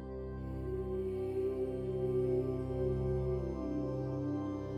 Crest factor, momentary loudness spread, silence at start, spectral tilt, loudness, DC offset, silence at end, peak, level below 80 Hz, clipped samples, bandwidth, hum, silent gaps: 12 dB; 6 LU; 0 s; -10 dB/octave; -37 LUFS; under 0.1%; 0 s; -24 dBFS; -48 dBFS; under 0.1%; 6.6 kHz; none; none